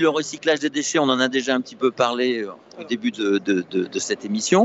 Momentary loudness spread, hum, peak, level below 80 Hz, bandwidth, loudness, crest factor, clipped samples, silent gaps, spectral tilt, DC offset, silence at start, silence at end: 6 LU; none; -4 dBFS; -72 dBFS; 8.2 kHz; -22 LUFS; 18 dB; under 0.1%; none; -3.5 dB/octave; under 0.1%; 0 s; 0 s